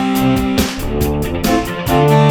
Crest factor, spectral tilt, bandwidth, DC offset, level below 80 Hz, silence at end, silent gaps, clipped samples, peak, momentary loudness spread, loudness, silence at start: 12 dB; -6 dB/octave; over 20 kHz; under 0.1%; -26 dBFS; 0 s; none; under 0.1%; -2 dBFS; 6 LU; -15 LUFS; 0 s